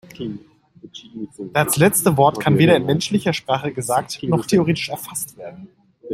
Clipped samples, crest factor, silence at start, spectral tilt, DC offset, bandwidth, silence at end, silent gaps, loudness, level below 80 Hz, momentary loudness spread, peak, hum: under 0.1%; 18 dB; 0.2 s; -5 dB/octave; under 0.1%; 16 kHz; 0 s; none; -18 LUFS; -54 dBFS; 21 LU; -2 dBFS; none